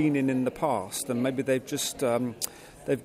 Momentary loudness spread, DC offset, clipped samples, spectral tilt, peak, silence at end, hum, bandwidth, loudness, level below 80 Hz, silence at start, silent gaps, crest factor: 7 LU; under 0.1%; under 0.1%; -4.5 dB/octave; -8 dBFS; 0 s; none; 16 kHz; -29 LUFS; -62 dBFS; 0 s; none; 20 dB